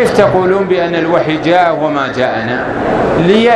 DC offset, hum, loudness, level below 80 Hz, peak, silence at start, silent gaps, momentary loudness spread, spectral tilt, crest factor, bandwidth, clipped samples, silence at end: under 0.1%; none; -12 LUFS; -38 dBFS; 0 dBFS; 0 s; none; 5 LU; -6.5 dB/octave; 10 dB; 13 kHz; 0.1%; 0 s